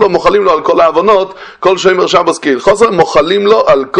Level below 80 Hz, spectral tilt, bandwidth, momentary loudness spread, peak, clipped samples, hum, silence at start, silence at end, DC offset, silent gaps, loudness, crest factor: -42 dBFS; -4.5 dB/octave; 10.5 kHz; 4 LU; 0 dBFS; 0.8%; none; 0 s; 0 s; under 0.1%; none; -9 LUFS; 8 dB